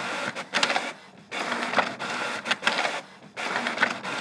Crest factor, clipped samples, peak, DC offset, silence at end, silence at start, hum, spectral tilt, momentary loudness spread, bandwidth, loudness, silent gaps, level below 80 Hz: 26 dB; under 0.1%; -4 dBFS; under 0.1%; 0 s; 0 s; none; -2 dB/octave; 12 LU; 11 kHz; -27 LUFS; none; -80 dBFS